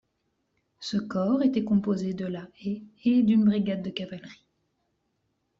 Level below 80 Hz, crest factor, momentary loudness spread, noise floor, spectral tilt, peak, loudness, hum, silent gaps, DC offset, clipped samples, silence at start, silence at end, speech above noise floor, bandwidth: -64 dBFS; 16 dB; 14 LU; -76 dBFS; -7 dB/octave; -12 dBFS; -26 LUFS; none; none; under 0.1%; under 0.1%; 0.8 s; 1.25 s; 50 dB; 7.6 kHz